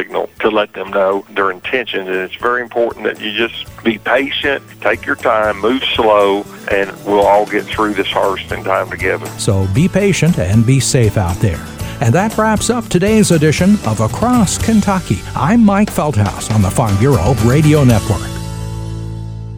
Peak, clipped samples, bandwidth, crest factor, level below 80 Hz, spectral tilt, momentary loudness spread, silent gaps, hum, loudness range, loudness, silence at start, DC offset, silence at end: 0 dBFS; under 0.1%; over 20 kHz; 14 dB; -32 dBFS; -5.5 dB/octave; 9 LU; none; none; 4 LU; -14 LUFS; 0 s; under 0.1%; 0 s